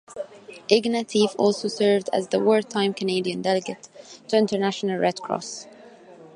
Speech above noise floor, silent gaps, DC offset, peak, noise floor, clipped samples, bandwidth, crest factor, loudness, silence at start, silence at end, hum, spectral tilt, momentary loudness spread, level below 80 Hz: 24 dB; none; under 0.1%; -2 dBFS; -47 dBFS; under 0.1%; 11 kHz; 22 dB; -23 LUFS; 0.1 s; 0.1 s; none; -4.5 dB/octave; 17 LU; -72 dBFS